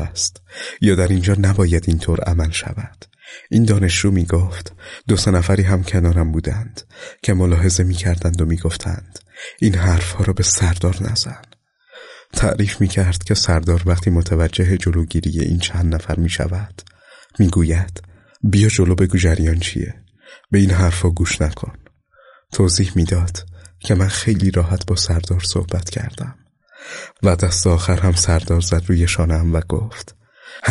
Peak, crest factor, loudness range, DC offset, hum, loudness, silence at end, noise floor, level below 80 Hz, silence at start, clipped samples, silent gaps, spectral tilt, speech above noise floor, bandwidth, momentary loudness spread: -4 dBFS; 14 dB; 3 LU; under 0.1%; none; -17 LUFS; 0 s; -50 dBFS; -28 dBFS; 0 s; under 0.1%; none; -5 dB/octave; 34 dB; 11.5 kHz; 15 LU